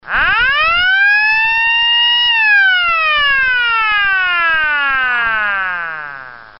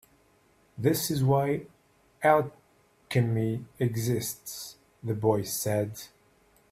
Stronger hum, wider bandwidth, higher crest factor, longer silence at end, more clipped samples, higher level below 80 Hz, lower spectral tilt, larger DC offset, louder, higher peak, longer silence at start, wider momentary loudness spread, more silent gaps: neither; second, 5.8 kHz vs 16 kHz; second, 12 dB vs 20 dB; second, 0.1 s vs 0.65 s; neither; first, -40 dBFS vs -62 dBFS; second, 4 dB/octave vs -5.5 dB/octave; neither; first, -11 LUFS vs -28 LUFS; first, -2 dBFS vs -8 dBFS; second, 0.05 s vs 0.75 s; second, 8 LU vs 16 LU; neither